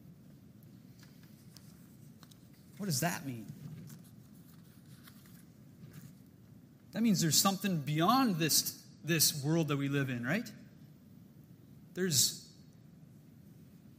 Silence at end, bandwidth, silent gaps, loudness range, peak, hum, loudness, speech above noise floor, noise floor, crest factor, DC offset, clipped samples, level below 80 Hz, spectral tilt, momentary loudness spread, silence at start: 0.45 s; 16 kHz; none; 12 LU; -14 dBFS; none; -31 LUFS; 26 dB; -57 dBFS; 24 dB; under 0.1%; under 0.1%; -74 dBFS; -3.5 dB/octave; 26 LU; 0.05 s